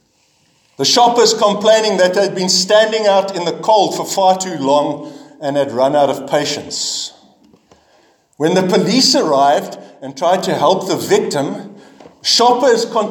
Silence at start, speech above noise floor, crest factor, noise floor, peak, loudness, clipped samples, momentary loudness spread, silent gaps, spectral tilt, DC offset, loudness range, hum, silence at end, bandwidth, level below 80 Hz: 0.8 s; 44 dB; 14 dB; -57 dBFS; 0 dBFS; -14 LUFS; under 0.1%; 10 LU; none; -3 dB/octave; under 0.1%; 5 LU; none; 0 s; 19 kHz; -66 dBFS